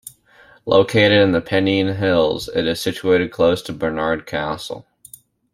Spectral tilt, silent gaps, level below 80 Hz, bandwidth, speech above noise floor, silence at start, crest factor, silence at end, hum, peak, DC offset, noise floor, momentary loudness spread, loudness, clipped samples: -5.5 dB/octave; none; -50 dBFS; 15.5 kHz; 32 dB; 0.65 s; 18 dB; 0.7 s; none; -2 dBFS; under 0.1%; -50 dBFS; 11 LU; -18 LUFS; under 0.1%